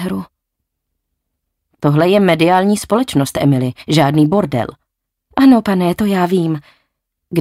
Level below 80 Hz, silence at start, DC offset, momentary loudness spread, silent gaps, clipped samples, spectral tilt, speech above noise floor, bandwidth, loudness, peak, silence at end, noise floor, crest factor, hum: -48 dBFS; 0 s; under 0.1%; 11 LU; none; under 0.1%; -6.5 dB/octave; 62 dB; 15.5 kHz; -14 LUFS; -2 dBFS; 0 s; -75 dBFS; 14 dB; none